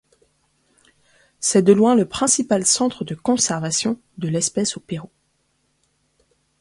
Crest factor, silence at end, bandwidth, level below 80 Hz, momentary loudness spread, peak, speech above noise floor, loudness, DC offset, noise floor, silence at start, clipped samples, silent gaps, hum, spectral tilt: 20 dB; 1.55 s; 11.5 kHz; -58 dBFS; 11 LU; -2 dBFS; 48 dB; -19 LUFS; under 0.1%; -67 dBFS; 1.4 s; under 0.1%; none; none; -4 dB/octave